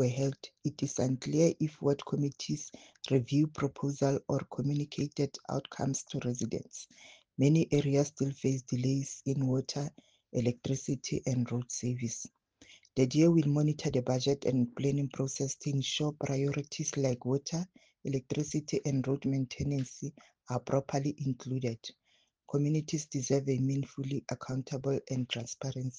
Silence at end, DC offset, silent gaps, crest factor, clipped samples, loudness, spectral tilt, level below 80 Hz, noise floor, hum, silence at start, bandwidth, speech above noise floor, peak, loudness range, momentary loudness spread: 0 s; under 0.1%; none; 18 dB; under 0.1%; -33 LUFS; -6 dB/octave; -64 dBFS; -66 dBFS; none; 0 s; 10 kHz; 34 dB; -14 dBFS; 5 LU; 10 LU